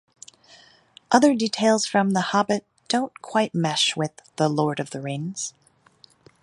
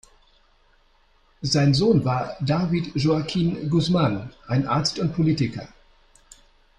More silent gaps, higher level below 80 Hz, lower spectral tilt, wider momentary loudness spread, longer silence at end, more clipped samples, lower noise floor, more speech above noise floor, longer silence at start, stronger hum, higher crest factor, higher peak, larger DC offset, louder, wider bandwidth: neither; second, -70 dBFS vs -50 dBFS; second, -4 dB/octave vs -6.5 dB/octave; first, 11 LU vs 7 LU; second, 0.9 s vs 1.15 s; neither; about the same, -56 dBFS vs -59 dBFS; second, 34 dB vs 38 dB; second, 1.1 s vs 1.4 s; neither; first, 22 dB vs 16 dB; first, -2 dBFS vs -8 dBFS; neither; about the same, -23 LUFS vs -22 LUFS; about the same, 11.5 kHz vs 10.5 kHz